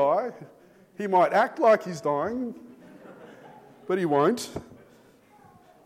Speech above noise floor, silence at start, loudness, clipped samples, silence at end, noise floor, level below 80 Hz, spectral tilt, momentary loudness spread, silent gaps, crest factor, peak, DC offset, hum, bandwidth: 32 dB; 0 s; -25 LUFS; under 0.1%; 1.1 s; -56 dBFS; -66 dBFS; -5.5 dB/octave; 24 LU; none; 18 dB; -8 dBFS; under 0.1%; none; 15 kHz